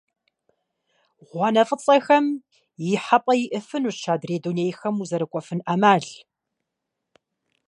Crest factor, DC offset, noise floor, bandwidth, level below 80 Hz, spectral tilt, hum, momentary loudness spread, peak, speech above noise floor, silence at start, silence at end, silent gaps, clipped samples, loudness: 20 dB; under 0.1%; -82 dBFS; 11 kHz; -76 dBFS; -5.5 dB/octave; none; 10 LU; -2 dBFS; 60 dB; 1.35 s; 1.55 s; none; under 0.1%; -22 LUFS